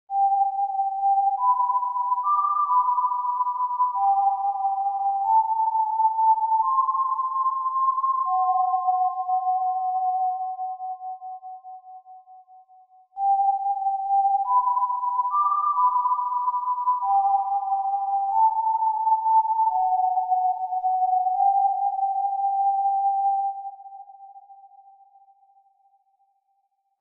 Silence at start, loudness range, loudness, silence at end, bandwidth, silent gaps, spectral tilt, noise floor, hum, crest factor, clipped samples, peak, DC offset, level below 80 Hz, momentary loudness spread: 0.1 s; 6 LU; -23 LUFS; 2.35 s; 1.4 kHz; none; -3.5 dB/octave; -71 dBFS; none; 12 dB; under 0.1%; -12 dBFS; under 0.1%; -84 dBFS; 6 LU